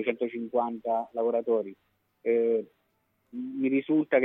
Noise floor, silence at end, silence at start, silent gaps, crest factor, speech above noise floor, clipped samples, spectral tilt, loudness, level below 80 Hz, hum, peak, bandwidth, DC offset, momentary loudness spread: -73 dBFS; 0 s; 0 s; none; 18 dB; 46 dB; under 0.1%; -9 dB/octave; -29 LUFS; -78 dBFS; none; -10 dBFS; 3.8 kHz; under 0.1%; 13 LU